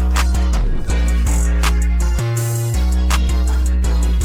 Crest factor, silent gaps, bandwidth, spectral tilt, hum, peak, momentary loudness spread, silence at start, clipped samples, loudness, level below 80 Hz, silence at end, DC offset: 12 dB; none; 16 kHz; -5 dB/octave; none; -4 dBFS; 2 LU; 0 s; under 0.1%; -18 LUFS; -16 dBFS; 0 s; under 0.1%